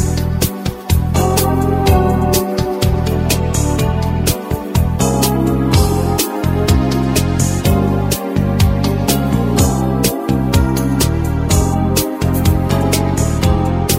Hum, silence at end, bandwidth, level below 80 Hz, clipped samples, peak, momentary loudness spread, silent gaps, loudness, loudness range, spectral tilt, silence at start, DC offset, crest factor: none; 0 s; 16.5 kHz; -22 dBFS; under 0.1%; 0 dBFS; 3 LU; none; -15 LUFS; 1 LU; -5.5 dB/octave; 0 s; under 0.1%; 14 dB